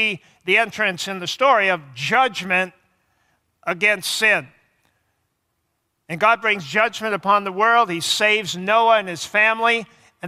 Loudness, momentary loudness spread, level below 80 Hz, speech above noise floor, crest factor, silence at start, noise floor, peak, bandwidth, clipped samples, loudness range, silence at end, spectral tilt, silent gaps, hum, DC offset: -18 LUFS; 8 LU; -70 dBFS; 53 dB; 18 dB; 0 s; -72 dBFS; -2 dBFS; 16 kHz; under 0.1%; 4 LU; 0 s; -2.5 dB/octave; none; none; under 0.1%